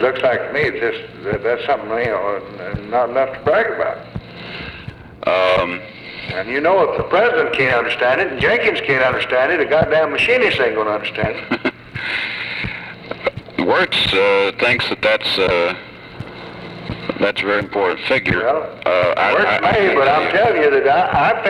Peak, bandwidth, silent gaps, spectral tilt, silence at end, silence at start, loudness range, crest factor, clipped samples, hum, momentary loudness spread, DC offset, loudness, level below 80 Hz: -2 dBFS; 12 kHz; none; -5.5 dB/octave; 0 s; 0 s; 5 LU; 16 dB; under 0.1%; none; 15 LU; under 0.1%; -16 LUFS; -46 dBFS